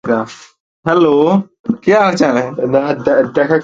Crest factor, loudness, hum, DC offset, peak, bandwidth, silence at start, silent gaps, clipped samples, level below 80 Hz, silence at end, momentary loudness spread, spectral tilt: 14 dB; -13 LUFS; none; under 0.1%; 0 dBFS; 7.8 kHz; 0.05 s; 0.60-0.83 s, 1.59-1.64 s; under 0.1%; -52 dBFS; 0 s; 8 LU; -6.5 dB/octave